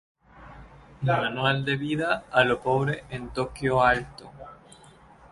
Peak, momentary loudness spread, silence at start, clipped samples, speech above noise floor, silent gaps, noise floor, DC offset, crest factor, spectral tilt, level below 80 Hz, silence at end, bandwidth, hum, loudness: -6 dBFS; 21 LU; 0.35 s; under 0.1%; 27 dB; none; -52 dBFS; under 0.1%; 22 dB; -6 dB/octave; -50 dBFS; 0.8 s; 11.5 kHz; none; -25 LUFS